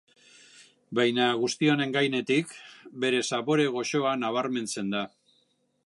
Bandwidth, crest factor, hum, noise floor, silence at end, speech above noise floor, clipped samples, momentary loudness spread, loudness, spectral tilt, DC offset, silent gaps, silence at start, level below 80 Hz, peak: 11.5 kHz; 18 dB; none; -70 dBFS; 0.8 s; 43 dB; under 0.1%; 9 LU; -27 LUFS; -4.5 dB/octave; under 0.1%; none; 0.6 s; -78 dBFS; -10 dBFS